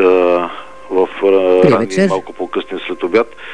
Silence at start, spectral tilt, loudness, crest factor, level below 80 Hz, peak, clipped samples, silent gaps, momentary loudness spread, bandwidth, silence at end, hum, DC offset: 0 s; -6.5 dB/octave; -14 LUFS; 14 dB; -52 dBFS; 0 dBFS; under 0.1%; none; 11 LU; 10 kHz; 0 s; none; 2%